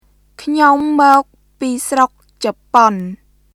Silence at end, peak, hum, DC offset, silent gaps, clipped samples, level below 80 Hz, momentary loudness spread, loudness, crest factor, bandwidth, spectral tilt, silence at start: 0.4 s; 0 dBFS; none; under 0.1%; none; 0.1%; -54 dBFS; 14 LU; -14 LUFS; 14 dB; 18 kHz; -4 dB/octave; 0.4 s